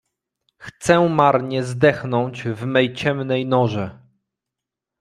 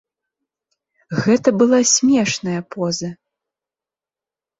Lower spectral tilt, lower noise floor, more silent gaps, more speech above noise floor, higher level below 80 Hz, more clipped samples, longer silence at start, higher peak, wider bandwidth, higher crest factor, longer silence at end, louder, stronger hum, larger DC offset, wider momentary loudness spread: first, -6 dB/octave vs -4 dB/octave; second, -85 dBFS vs -90 dBFS; neither; second, 66 dB vs 73 dB; about the same, -56 dBFS vs -60 dBFS; neither; second, 0.6 s vs 1.1 s; about the same, 0 dBFS vs -2 dBFS; first, 12.5 kHz vs 8 kHz; about the same, 20 dB vs 18 dB; second, 1.05 s vs 1.45 s; about the same, -19 LUFS vs -17 LUFS; neither; neither; about the same, 10 LU vs 12 LU